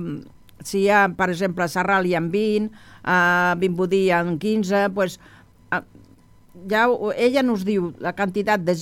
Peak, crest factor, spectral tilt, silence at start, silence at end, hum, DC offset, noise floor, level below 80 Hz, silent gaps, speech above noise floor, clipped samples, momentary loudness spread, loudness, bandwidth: -4 dBFS; 16 dB; -5.5 dB/octave; 0 s; 0 s; none; under 0.1%; -51 dBFS; -56 dBFS; none; 30 dB; under 0.1%; 10 LU; -21 LUFS; 16.5 kHz